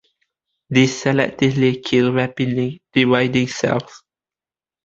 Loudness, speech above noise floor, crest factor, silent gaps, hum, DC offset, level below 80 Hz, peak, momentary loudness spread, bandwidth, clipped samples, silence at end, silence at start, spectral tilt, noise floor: -18 LUFS; over 72 dB; 18 dB; none; none; under 0.1%; -54 dBFS; 0 dBFS; 5 LU; 7.8 kHz; under 0.1%; 0.9 s; 0.7 s; -5.5 dB/octave; under -90 dBFS